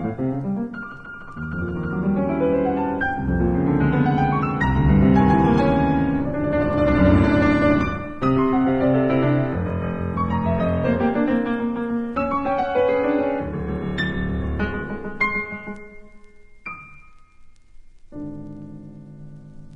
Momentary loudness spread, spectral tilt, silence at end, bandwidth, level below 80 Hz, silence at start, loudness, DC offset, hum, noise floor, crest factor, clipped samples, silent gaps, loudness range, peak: 19 LU; -9 dB/octave; 0 s; 7.6 kHz; -36 dBFS; 0 s; -21 LUFS; under 0.1%; none; -45 dBFS; 18 dB; under 0.1%; none; 12 LU; -4 dBFS